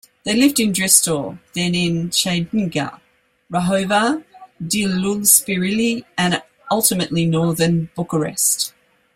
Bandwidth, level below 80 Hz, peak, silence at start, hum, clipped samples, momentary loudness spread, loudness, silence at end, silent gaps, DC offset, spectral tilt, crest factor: 16.5 kHz; -54 dBFS; 0 dBFS; 0.25 s; none; under 0.1%; 12 LU; -17 LUFS; 0.45 s; none; under 0.1%; -3.5 dB/octave; 18 dB